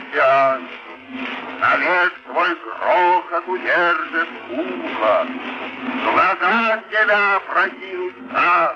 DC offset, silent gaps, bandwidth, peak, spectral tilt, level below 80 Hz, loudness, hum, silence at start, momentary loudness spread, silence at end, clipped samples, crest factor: under 0.1%; none; 7.6 kHz; -6 dBFS; -5 dB/octave; -68 dBFS; -18 LUFS; none; 0 s; 12 LU; 0 s; under 0.1%; 14 dB